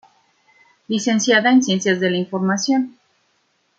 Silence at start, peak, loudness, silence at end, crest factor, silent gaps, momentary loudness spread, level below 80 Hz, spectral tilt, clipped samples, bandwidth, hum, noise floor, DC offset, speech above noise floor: 0.9 s; -2 dBFS; -18 LUFS; 0.9 s; 18 dB; none; 8 LU; -68 dBFS; -4 dB/octave; under 0.1%; 8 kHz; none; -65 dBFS; under 0.1%; 48 dB